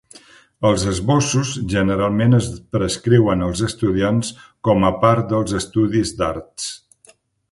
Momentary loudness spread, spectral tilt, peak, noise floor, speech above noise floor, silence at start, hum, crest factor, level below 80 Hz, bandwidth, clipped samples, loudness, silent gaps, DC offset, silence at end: 9 LU; -6 dB/octave; 0 dBFS; -53 dBFS; 35 dB; 0.6 s; none; 18 dB; -40 dBFS; 11.5 kHz; under 0.1%; -19 LUFS; none; under 0.1%; 0.75 s